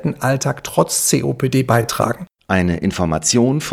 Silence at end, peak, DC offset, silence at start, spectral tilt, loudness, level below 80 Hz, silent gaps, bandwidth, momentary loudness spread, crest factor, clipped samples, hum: 0 s; 0 dBFS; under 0.1%; 0 s; -4.5 dB/octave; -17 LUFS; -42 dBFS; none; 17.5 kHz; 5 LU; 18 dB; under 0.1%; none